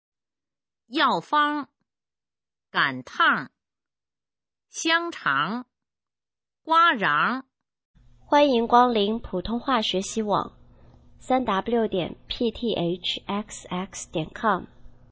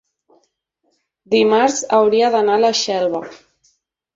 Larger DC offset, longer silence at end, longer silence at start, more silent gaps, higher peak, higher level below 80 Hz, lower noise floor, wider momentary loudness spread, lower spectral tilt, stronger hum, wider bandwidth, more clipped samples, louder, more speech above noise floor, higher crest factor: neither; second, 0.2 s vs 0.8 s; second, 0.9 s vs 1.3 s; first, 7.85-7.94 s vs none; about the same, -4 dBFS vs -2 dBFS; first, -54 dBFS vs -64 dBFS; first, under -90 dBFS vs -68 dBFS; first, 13 LU vs 8 LU; about the same, -4 dB/octave vs -3 dB/octave; neither; about the same, 8 kHz vs 8 kHz; neither; second, -24 LUFS vs -16 LUFS; first, over 66 dB vs 52 dB; first, 22 dB vs 16 dB